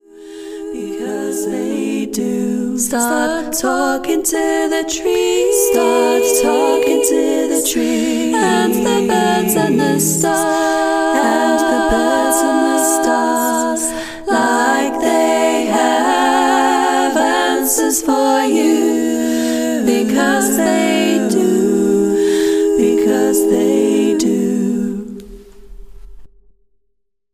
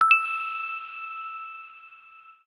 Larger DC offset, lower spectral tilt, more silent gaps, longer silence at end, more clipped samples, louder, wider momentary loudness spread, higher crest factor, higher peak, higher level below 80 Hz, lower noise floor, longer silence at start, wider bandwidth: neither; first, -3.5 dB/octave vs 1.5 dB/octave; neither; first, 1.05 s vs 0.15 s; neither; first, -14 LUFS vs -27 LUFS; second, 6 LU vs 26 LU; second, 14 dB vs 22 dB; first, -2 dBFS vs -6 dBFS; first, -44 dBFS vs -86 dBFS; first, -70 dBFS vs -52 dBFS; first, 0.15 s vs 0 s; first, 16 kHz vs 11 kHz